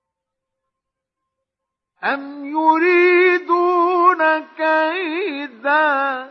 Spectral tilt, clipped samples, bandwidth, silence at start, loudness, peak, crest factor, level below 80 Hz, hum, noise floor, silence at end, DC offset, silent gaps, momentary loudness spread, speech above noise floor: -4.5 dB/octave; under 0.1%; 6 kHz; 2 s; -17 LUFS; -2 dBFS; 16 dB; -82 dBFS; none; -83 dBFS; 0 s; under 0.1%; none; 11 LU; 65 dB